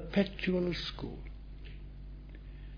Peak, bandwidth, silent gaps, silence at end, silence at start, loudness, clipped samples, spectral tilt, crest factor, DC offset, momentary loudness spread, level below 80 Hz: -16 dBFS; 5.2 kHz; none; 0 s; 0 s; -34 LUFS; under 0.1%; -5 dB/octave; 22 dB; under 0.1%; 18 LU; -46 dBFS